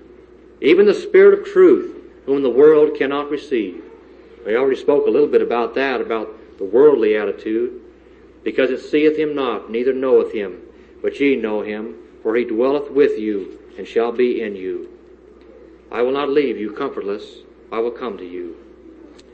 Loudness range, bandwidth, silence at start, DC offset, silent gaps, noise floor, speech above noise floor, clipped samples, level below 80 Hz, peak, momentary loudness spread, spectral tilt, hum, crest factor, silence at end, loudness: 9 LU; 8 kHz; 0.6 s; under 0.1%; none; -46 dBFS; 29 dB; under 0.1%; -56 dBFS; -2 dBFS; 17 LU; -6.5 dB/octave; none; 16 dB; 0.8 s; -17 LUFS